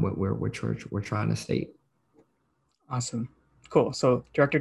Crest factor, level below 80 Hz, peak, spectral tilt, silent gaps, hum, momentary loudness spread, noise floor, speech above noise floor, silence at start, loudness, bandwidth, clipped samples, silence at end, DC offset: 22 dB; -52 dBFS; -8 dBFS; -6 dB/octave; none; none; 10 LU; -73 dBFS; 46 dB; 0 s; -28 LUFS; 12 kHz; under 0.1%; 0 s; under 0.1%